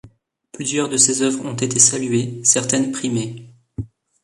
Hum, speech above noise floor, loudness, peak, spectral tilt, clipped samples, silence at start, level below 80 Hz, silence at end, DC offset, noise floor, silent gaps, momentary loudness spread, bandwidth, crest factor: none; 30 dB; -17 LUFS; 0 dBFS; -3 dB/octave; under 0.1%; 0.05 s; -52 dBFS; 0.4 s; under 0.1%; -49 dBFS; none; 20 LU; 11.5 kHz; 20 dB